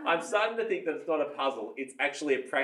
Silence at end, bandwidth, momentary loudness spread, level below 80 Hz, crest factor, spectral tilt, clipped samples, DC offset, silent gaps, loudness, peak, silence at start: 0 s; 12 kHz; 5 LU; under -90 dBFS; 18 dB; -3 dB/octave; under 0.1%; under 0.1%; none; -31 LUFS; -12 dBFS; 0 s